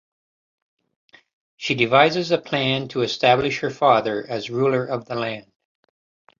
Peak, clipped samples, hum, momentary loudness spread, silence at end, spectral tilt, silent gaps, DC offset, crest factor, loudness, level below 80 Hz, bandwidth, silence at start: -2 dBFS; under 0.1%; none; 11 LU; 1 s; -5.5 dB/octave; none; under 0.1%; 20 dB; -20 LUFS; -60 dBFS; 7.6 kHz; 1.6 s